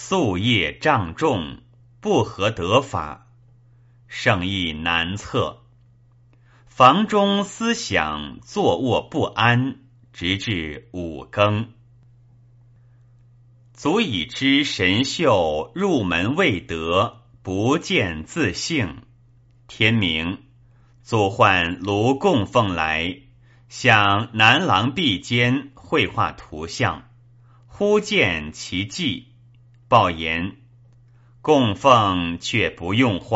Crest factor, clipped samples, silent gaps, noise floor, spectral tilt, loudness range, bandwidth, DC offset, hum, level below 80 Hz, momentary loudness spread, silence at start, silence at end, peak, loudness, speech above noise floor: 22 dB; under 0.1%; none; -53 dBFS; -3.5 dB/octave; 6 LU; 8 kHz; under 0.1%; none; -48 dBFS; 13 LU; 0 s; 0 s; 0 dBFS; -20 LUFS; 33 dB